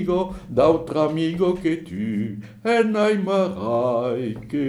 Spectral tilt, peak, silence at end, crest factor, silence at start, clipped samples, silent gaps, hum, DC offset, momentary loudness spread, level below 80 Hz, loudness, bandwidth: -7 dB/octave; -4 dBFS; 0 s; 18 dB; 0 s; under 0.1%; none; none; under 0.1%; 9 LU; -50 dBFS; -22 LUFS; 12 kHz